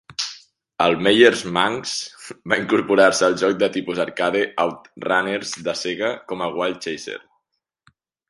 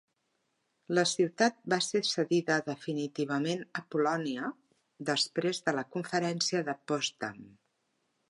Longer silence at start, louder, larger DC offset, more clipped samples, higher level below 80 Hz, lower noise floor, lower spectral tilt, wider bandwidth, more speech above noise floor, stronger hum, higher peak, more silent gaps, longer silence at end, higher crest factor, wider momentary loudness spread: second, 0.1 s vs 0.9 s; first, -20 LUFS vs -31 LUFS; neither; neither; first, -60 dBFS vs -82 dBFS; about the same, -77 dBFS vs -79 dBFS; about the same, -3.5 dB/octave vs -4 dB/octave; about the same, 11.5 kHz vs 11.5 kHz; first, 57 dB vs 47 dB; neither; first, 0 dBFS vs -10 dBFS; neither; first, 1.1 s vs 0.8 s; about the same, 20 dB vs 22 dB; first, 14 LU vs 8 LU